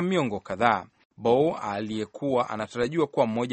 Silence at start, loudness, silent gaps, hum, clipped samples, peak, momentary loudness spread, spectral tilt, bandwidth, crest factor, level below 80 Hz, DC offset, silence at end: 0 s; -26 LUFS; 1.05-1.10 s; none; under 0.1%; -4 dBFS; 8 LU; -6.5 dB/octave; 8.4 kHz; 22 dB; -62 dBFS; under 0.1%; 0 s